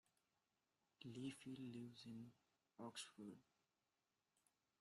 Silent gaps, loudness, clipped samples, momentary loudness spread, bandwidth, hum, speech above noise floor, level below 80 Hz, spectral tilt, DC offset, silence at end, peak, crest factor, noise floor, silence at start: none; -57 LUFS; under 0.1%; 8 LU; 13 kHz; none; over 34 dB; under -90 dBFS; -4.5 dB/octave; under 0.1%; 1.4 s; -42 dBFS; 18 dB; under -90 dBFS; 1 s